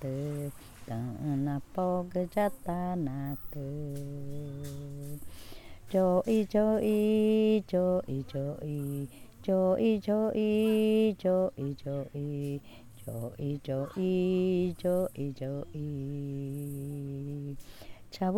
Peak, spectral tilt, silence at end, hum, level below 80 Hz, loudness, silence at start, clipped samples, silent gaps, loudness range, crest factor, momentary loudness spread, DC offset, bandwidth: -16 dBFS; -8 dB/octave; 0 s; none; -56 dBFS; -31 LUFS; 0 s; under 0.1%; none; 7 LU; 16 dB; 15 LU; under 0.1%; 18.5 kHz